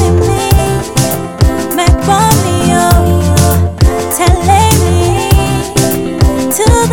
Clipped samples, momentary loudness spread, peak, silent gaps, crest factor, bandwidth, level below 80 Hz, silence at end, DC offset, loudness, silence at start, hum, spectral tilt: 0.4%; 4 LU; 0 dBFS; none; 10 dB; 18 kHz; -16 dBFS; 0 s; 2%; -10 LUFS; 0 s; none; -5 dB/octave